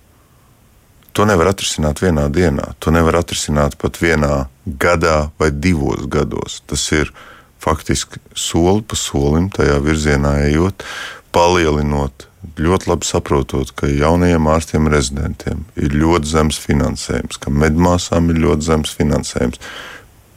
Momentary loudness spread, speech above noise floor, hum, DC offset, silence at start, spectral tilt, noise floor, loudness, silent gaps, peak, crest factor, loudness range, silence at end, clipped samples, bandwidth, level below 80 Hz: 9 LU; 34 dB; none; under 0.1%; 1.15 s; -5.5 dB/octave; -49 dBFS; -16 LUFS; none; -2 dBFS; 14 dB; 2 LU; 0.35 s; under 0.1%; 16 kHz; -26 dBFS